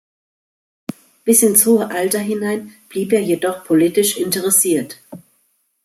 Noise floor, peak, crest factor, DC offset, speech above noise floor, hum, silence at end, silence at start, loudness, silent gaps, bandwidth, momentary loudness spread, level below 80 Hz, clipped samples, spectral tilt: -64 dBFS; 0 dBFS; 18 dB; under 0.1%; 47 dB; none; 0.65 s; 1.25 s; -15 LUFS; none; 16 kHz; 21 LU; -64 dBFS; under 0.1%; -3.5 dB/octave